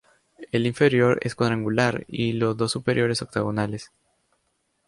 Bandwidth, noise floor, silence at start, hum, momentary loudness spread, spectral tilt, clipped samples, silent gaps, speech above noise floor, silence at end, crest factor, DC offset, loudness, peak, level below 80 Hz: 11.5 kHz; -72 dBFS; 0.4 s; none; 8 LU; -6 dB/octave; under 0.1%; none; 49 dB; 1 s; 18 dB; under 0.1%; -23 LUFS; -6 dBFS; -56 dBFS